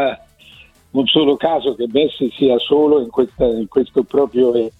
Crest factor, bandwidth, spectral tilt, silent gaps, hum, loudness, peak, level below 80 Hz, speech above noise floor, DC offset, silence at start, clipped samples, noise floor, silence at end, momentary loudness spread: 14 dB; 4.3 kHz; -7 dB/octave; none; none; -16 LUFS; -2 dBFS; -46 dBFS; 30 dB; under 0.1%; 0 s; under 0.1%; -45 dBFS; 0.1 s; 6 LU